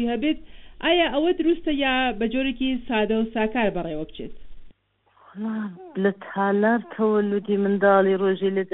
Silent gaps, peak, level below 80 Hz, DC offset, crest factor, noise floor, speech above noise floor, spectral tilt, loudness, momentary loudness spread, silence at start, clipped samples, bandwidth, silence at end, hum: none; -6 dBFS; -46 dBFS; under 0.1%; 16 dB; -63 dBFS; 40 dB; -3.5 dB/octave; -23 LUFS; 12 LU; 0 s; under 0.1%; 4.1 kHz; 0.05 s; none